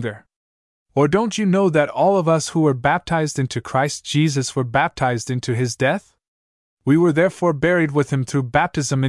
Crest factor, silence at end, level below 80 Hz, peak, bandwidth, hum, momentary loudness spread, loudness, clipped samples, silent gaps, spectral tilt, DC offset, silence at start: 18 dB; 0 s; -52 dBFS; -2 dBFS; 12 kHz; none; 6 LU; -19 LUFS; under 0.1%; 0.36-0.86 s, 6.28-6.77 s; -5.5 dB/octave; under 0.1%; 0 s